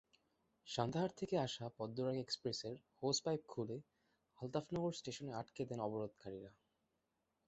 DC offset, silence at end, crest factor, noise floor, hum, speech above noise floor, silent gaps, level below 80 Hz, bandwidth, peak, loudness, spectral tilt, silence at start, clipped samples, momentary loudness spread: under 0.1%; 0.95 s; 22 dB; -86 dBFS; none; 43 dB; none; -76 dBFS; 8 kHz; -22 dBFS; -44 LUFS; -5 dB/octave; 0.65 s; under 0.1%; 13 LU